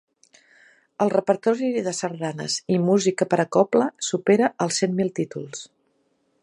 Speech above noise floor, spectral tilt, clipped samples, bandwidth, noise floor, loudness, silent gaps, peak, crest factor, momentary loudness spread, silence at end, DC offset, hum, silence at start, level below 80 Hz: 46 dB; -5 dB/octave; under 0.1%; 11 kHz; -68 dBFS; -22 LUFS; none; -4 dBFS; 18 dB; 10 LU; 0.8 s; under 0.1%; none; 1 s; -70 dBFS